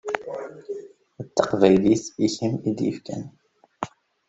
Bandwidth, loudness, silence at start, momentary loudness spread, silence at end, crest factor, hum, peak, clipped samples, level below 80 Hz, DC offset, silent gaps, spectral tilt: 8.2 kHz; -23 LUFS; 0.05 s; 19 LU; 0.4 s; 22 dB; none; -2 dBFS; under 0.1%; -60 dBFS; under 0.1%; none; -6 dB/octave